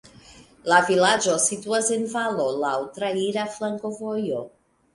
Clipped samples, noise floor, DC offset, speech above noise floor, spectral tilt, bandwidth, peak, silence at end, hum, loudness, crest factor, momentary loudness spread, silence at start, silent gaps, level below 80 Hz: under 0.1%; -49 dBFS; under 0.1%; 26 dB; -2.5 dB/octave; 11.5 kHz; -4 dBFS; 0.45 s; none; -23 LUFS; 20 dB; 11 LU; 0.3 s; none; -64 dBFS